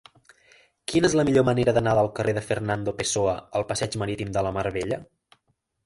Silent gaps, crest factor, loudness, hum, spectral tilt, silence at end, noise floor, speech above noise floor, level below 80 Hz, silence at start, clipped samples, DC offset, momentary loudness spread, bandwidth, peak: none; 20 dB; -24 LUFS; none; -5 dB/octave; 0.8 s; -72 dBFS; 49 dB; -50 dBFS; 0.9 s; under 0.1%; under 0.1%; 9 LU; 11.5 kHz; -6 dBFS